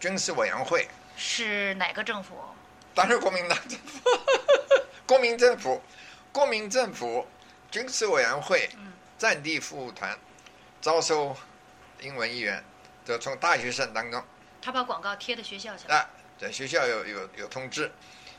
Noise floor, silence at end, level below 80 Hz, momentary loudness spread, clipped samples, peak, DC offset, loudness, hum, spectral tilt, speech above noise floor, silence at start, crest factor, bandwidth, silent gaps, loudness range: -53 dBFS; 0 s; -70 dBFS; 15 LU; under 0.1%; -4 dBFS; under 0.1%; -27 LUFS; none; -2 dB/octave; 25 dB; 0 s; 24 dB; 13 kHz; none; 6 LU